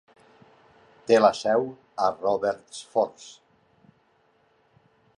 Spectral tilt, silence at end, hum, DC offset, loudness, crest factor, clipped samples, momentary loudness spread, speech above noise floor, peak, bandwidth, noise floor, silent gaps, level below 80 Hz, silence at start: -4.5 dB/octave; 1.85 s; none; under 0.1%; -24 LUFS; 22 dB; under 0.1%; 20 LU; 41 dB; -6 dBFS; 11 kHz; -65 dBFS; none; -70 dBFS; 1.1 s